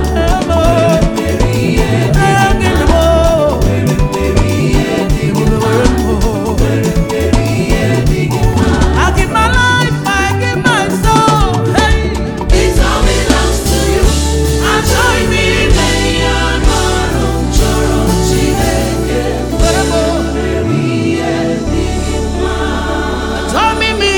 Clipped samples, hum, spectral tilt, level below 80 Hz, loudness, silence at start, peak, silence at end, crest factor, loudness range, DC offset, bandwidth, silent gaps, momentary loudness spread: under 0.1%; none; -5 dB/octave; -16 dBFS; -12 LUFS; 0 s; 0 dBFS; 0 s; 10 dB; 3 LU; under 0.1%; 20 kHz; none; 5 LU